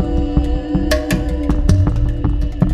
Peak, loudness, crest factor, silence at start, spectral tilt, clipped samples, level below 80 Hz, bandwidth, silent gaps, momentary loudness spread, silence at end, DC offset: 0 dBFS; -18 LUFS; 14 dB; 0 s; -7 dB/octave; under 0.1%; -18 dBFS; 15 kHz; none; 4 LU; 0 s; under 0.1%